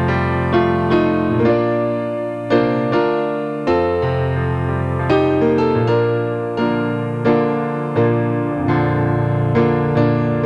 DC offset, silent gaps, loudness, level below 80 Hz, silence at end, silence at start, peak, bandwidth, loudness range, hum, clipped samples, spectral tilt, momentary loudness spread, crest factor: under 0.1%; none; -17 LUFS; -40 dBFS; 0 s; 0 s; -2 dBFS; 9.8 kHz; 1 LU; none; under 0.1%; -9 dB/octave; 4 LU; 14 dB